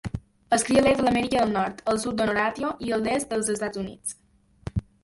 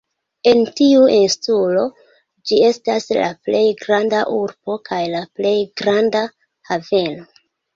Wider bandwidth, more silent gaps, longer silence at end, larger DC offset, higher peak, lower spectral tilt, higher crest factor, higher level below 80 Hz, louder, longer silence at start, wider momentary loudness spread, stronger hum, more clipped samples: first, 12 kHz vs 7.6 kHz; neither; second, 0.2 s vs 0.55 s; neither; second, -6 dBFS vs -2 dBFS; about the same, -4.5 dB/octave vs -4.5 dB/octave; about the same, 18 dB vs 16 dB; first, -46 dBFS vs -60 dBFS; second, -25 LUFS vs -17 LUFS; second, 0.05 s vs 0.45 s; about the same, 14 LU vs 12 LU; neither; neither